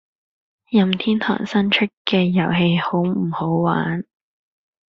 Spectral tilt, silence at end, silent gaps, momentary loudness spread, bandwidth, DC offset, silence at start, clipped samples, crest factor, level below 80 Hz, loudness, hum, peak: -4.5 dB/octave; 0.85 s; 1.97-2.05 s; 5 LU; 6.8 kHz; under 0.1%; 0.7 s; under 0.1%; 18 dB; -58 dBFS; -19 LUFS; none; -2 dBFS